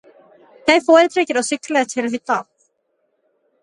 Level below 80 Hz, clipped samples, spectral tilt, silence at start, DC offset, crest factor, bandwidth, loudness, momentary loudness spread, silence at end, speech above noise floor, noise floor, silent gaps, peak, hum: -64 dBFS; under 0.1%; -2.5 dB/octave; 0.65 s; under 0.1%; 18 dB; 11.5 kHz; -17 LUFS; 11 LU; 1.2 s; 52 dB; -68 dBFS; none; 0 dBFS; none